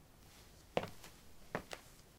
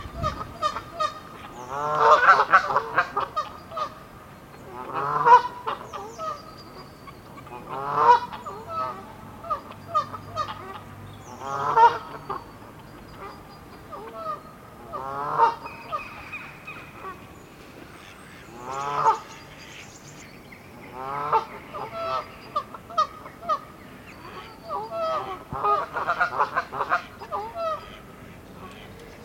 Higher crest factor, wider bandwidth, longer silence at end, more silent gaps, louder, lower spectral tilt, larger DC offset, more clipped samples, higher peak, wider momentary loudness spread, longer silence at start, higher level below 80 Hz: first, 32 dB vs 26 dB; about the same, 17 kHz vs 16.5 kHz; about the same, 0 s vs 0 s; neither; second, -46 LUFS vs -25 LUFS; about the same, -4.5 dB/octave vs -4 dB/octave; neither; neither; second, -16 dBFS vs -2 dBFS; second, 18 LU vs 25 LU; about the same, 0 s vs 0 s; second, -66 dBFS vs -54 dBFS